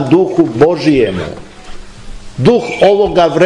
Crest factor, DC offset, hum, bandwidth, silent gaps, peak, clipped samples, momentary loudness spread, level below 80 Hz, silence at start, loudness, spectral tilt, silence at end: 12 dB; under 0.1%; none; 11 kHz; none; 0 dBFS; under 0.1%; 14 LU; -34 dBFS; 0 s; -11 LUFS; -7 dB/octave; 0 s